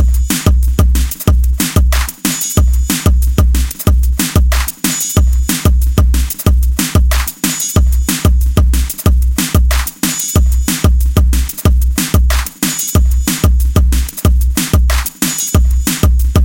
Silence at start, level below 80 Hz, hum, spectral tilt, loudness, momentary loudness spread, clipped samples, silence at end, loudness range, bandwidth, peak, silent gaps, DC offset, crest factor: 0 s; -12 dBFS; none; -4.5 dB/octave; -13 LUFS; 2 LU; under 0.1%; 0 s; 0 LU; 17.5 kHz; 0 dBFS; none; under 0.1%; 10 dB